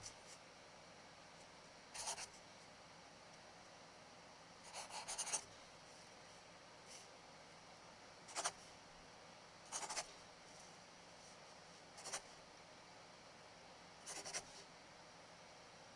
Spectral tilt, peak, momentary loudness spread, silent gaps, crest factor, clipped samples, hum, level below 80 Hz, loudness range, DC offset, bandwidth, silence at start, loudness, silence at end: -0.5 dB/octave; -28 dBFS; 15 LU; none; 28 dB; under 0.1%; none; -80 dBFS; 5 LU; under 0.1%; 12 kHz; 0 s; -53 LUFS; 0 s